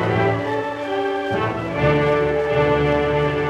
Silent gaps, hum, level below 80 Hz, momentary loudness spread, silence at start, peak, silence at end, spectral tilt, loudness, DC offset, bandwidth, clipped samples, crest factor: none; none; -38 dBFS; 6 LU; 0 s; -4 dBFS; 0 s; -7.5 dB/octave; -20 LUFS; under 0.1%; 10 kHz; under 0.1%; 14 dB